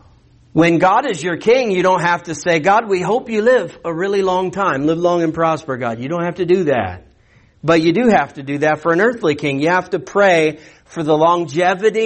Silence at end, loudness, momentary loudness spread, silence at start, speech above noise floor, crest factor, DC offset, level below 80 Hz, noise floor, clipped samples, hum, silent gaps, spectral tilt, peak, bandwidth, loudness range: 0 s; -16 LUFS; 8 LU; 0.55 s; 36 dB; 14 dB; under 0.1%; -54 dBFS; -51 dBFS; under 0.1%; none; none; -5.5 dB/octave; -2 dBFS; 8.8 kHz; 3 LU